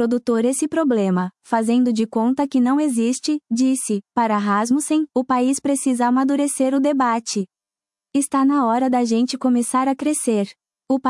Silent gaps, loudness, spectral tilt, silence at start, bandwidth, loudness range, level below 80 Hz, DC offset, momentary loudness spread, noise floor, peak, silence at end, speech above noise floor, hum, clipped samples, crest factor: none; -19 LUFS; -4.5 dB/octave; 0 s; 12 kHz; 1 LU; -70 dBFS; under 0.1%; 5 LU; under -90 dBFS; -6 dBFS; 0 s; over 71 dB; none; under 0.1%; 14 dB